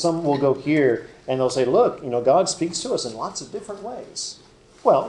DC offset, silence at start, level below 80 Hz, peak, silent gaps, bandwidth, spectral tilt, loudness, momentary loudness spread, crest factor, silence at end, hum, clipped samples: under 0.1%; 0 s; -58 dBFS; -4 dBFS; none; 11 kHz; -4.5 dB/octave; -22 LUFS; 14 LU; 18 dB; 0 s; none; under 0.1%